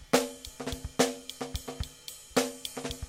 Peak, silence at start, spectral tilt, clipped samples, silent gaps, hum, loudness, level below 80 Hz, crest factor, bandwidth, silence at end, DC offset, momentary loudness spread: -8 dBFS; 0 s; -3.5 dB/octave; under 0.1%; none; none; -33 LUFS; -48 dBFS; 26 dB; 16.5 kHz; 0 s; under 0.1%; 11 LU